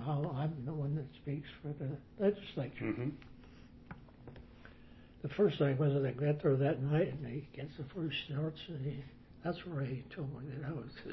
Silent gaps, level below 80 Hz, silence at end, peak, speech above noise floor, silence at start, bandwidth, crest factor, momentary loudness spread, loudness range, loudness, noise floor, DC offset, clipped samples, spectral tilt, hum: none; -62 dBFS; 0 s; -20 dBFS; 20 dB; 0 s; 5.8 kHz; 18 dB; 23 LU; 7 LU; -37 LUFS; -57 dBFS; under 0.1%; under 0.1%; -7 dB/octave; none